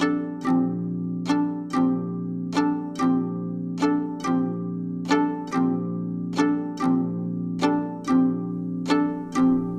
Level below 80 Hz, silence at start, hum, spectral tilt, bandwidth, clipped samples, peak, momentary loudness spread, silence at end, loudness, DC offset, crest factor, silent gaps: -60 dBFS; 0 s; none; -7 dB/octave; 10 kHz; under 0.1%; -8 dBFS; 7 LU; 0 s; -25 LUFS; under 0.1%; 16 dB; none